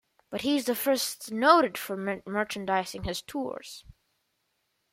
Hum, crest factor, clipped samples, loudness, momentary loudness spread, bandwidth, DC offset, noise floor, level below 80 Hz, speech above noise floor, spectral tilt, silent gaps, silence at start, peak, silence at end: none; 24 dB; under 0.1%; -28 LUFS; 16 LU; 16.5 kHz; under 0.1%; -77 dBFS; -58 dBFS; 49 dB; -3.5 dB/octave; none; 0.3 s; -6 dBFS; 1.1 s